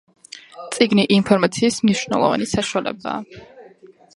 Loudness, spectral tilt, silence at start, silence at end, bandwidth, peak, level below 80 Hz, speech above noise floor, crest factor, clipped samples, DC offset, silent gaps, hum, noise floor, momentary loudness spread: -19 LUFS; -4.5 dB/octave; 0.35 s; 0.5 s; 11.5 kHz; 0 dBFS; -52 dBFS; 29 dB; 20 dB; under 0.1%; under 0.1%; none; none; -47 dBFS; 22 LU